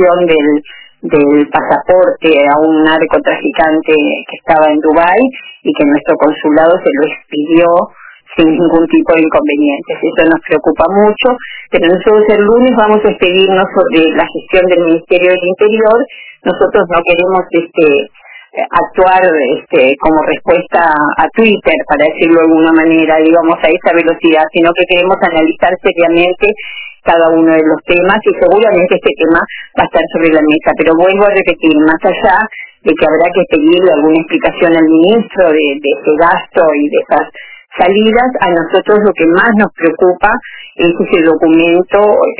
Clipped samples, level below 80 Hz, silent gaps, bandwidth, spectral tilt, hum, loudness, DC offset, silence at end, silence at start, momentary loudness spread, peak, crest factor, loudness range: 0.7%; -42 dBFS; none; 4 kHz; -9.5 dB/octave; none; -9 LUFS; under 0.1%; 0.05 s; 0 s; 6 LU; 0 dBFS; 8 dB; 2 LU